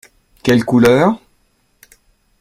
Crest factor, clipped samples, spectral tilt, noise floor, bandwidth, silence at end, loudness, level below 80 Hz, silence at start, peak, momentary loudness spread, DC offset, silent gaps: 16 dB; under 0.1%; -6.5 dB/octave; -59 dBFS; 15.5 kHz; 1.25 s; -13 LUFS; -48 dBFS; 0.45 s; 0 dBFS; 11 LU; under 0.1%; none